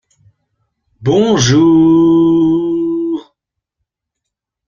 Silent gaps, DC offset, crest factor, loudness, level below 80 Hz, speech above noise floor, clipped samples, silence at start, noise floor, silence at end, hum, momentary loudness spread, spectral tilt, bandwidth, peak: none; under 0.1%; 14 dB; -11 LUFS; -46 dBFS; 70 dB; under 0.1%; 1 s; -78 dBFS; 1.5 s; none; 11 LU; -6 dB/octave; 7.2 kHz; 0 dBFS